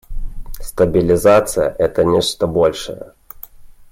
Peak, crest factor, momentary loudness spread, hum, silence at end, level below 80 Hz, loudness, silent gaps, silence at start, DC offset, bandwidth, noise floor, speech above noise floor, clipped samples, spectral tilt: -2 dBFS; 14 dB; 23 LU; none; 0.1 s; -32 dBFS; -15 LUFS; none; 0.1 s; under 0.1%; 16.5 kHz; -38 dBFS; 23 dB; under 0.1%; -5 dB/octave